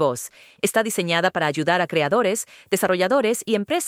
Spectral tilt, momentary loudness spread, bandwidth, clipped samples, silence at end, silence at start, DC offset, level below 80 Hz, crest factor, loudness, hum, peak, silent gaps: -3.5 dB/octave; 7 LU; 16.5 kHz; under 0.1%; 0 s; 0 s; under 0.1%; -66 dBFS; 16 dB; -21 LUFS; none; -4 dBFS; none